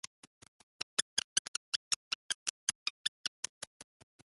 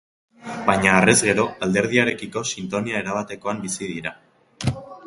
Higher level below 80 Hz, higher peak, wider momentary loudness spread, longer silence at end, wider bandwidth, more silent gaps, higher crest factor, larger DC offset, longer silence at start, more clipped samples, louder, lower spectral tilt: second, -82 dBFS vs -50 dBFS; second, -12 dBFS vs 0 dBFS; about the same, 11 LU vs 13 LU; first, 0.5 s vs 0 s; about the same, 12 kHz vs 11.5 kHz; first, 0.07-0.41 s, 0.48-1.17 s, 1.24-2.67 s, 2.75-3.43 s, 3.49-3.61 s, 3.67-3.80 s vs none; first, 30 dB vs 22 dB; neither; second, 0.05 s vs 0.4 s; neither; second, -37 LUFS vs -21 LUFS; second, 2 dB/octave vs -4 dB/octave